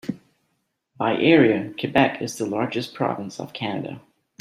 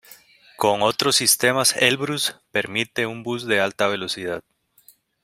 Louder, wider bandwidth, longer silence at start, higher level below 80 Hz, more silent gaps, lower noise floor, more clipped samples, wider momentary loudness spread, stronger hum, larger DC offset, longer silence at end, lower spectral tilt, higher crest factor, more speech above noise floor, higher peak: about the same, -22 LUFS vs -20 LUFS; second, 14.5 kHz vs 16 kHz; about the same, 0.05 s vs 0.1 s; about the same, -62 dBFS vs -64 dBFS; neither; first, -73 dBFS vs -56 dBFS; neither; first, 17 LU vs 11 LU; neither; neither; second, 0.4 s vs 0.85 s; first, -5.5 dB/octave vs -2 dB/octave; about the same, 20 dB vs 22 dB; first, 52 dB vs 34 dB; about the same, -2 dBFS vs 0 dBFS